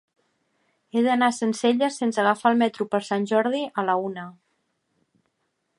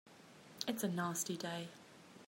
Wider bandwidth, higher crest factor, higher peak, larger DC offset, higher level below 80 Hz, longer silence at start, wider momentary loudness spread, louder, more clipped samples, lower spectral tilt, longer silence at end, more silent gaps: second, 11.5 kHz vs 16 kHz; second, 20 dB vs 26 dB; first, -6 dBFS vs -18 dBFS; neither; first, -78 dBFS vs -86 dBFS; first, 0.95 s vs 0.05 s; second, 8 LU vs 20 LU; first, -23 LUFS vs -41 LUFS; neither; about the same, -4.5 dB/octave vs -4 dB/octave; first, 1.45 s vs 0 s; neither